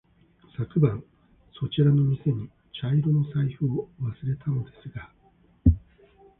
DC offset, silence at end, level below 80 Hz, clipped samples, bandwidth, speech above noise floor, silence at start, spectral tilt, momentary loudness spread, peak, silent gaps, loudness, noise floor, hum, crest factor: under 0.1%; 0.6 s; -38 dBFS; under 0.1%; 3.8 kHz; 34 dB; 0.6 s; -12.5 dB/octave; 17 LU; -6 dBFS; none; -26 LUFS; -59 dBFS; none; 20 dB